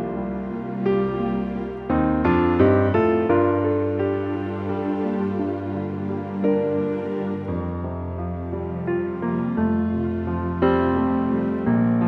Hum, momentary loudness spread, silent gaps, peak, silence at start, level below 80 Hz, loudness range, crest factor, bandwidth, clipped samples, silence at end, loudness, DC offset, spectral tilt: none; 9 LU; none; -4 dBFS; 0 s; -42 dBFS; 5 LU; 18 dB; 5.4 kHz; under 0.1%; 0 s; -23 LUFS; under 0.1%; -10.5 dB/octave